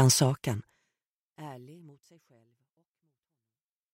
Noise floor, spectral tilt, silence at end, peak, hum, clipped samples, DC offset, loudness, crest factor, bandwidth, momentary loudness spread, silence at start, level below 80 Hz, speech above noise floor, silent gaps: under -90 dBFS; -4.5 dB/octave; 2.3 s; -8 dBFS; none; under 0.1%; under 0.1%; -27 LUFS; 24 dB; 16 kHz; 24 LU; 0 s; -68 dBFS; over 63 dB; 1.06-1.30 s